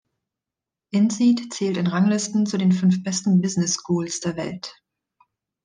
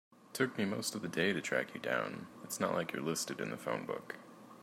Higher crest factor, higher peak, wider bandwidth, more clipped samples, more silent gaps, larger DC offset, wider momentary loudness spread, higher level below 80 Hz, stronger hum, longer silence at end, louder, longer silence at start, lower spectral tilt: second, 14 dB vs 20 dB; first, -8 dBFS vs -18 dBFS; second, 10 kHz vs 16 kHz; neither; neither; neither; second, 9 LU vs 13 LU; first, -66 dBFS vs -80 dBFS; neither; first, 0.95 s vs 0 s; first, -22 LUFS vs -37 LUFS; first, 0.95 s vs 0.2 s; first, -5.5 dB/octave vs -4 dB/octave